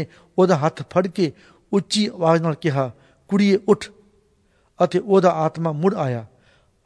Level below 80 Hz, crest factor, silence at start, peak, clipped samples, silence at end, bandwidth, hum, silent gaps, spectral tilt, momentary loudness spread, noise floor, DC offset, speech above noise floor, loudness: -62 dBFS; 18 dB; 0 s; -2 dBFS; under 0.1%; 0.6 s; 11 kHz; none; none; -6.5 dB/octave; 8 LU; -61 dBFS; under 0.1%; 42 dB; -20 LUFS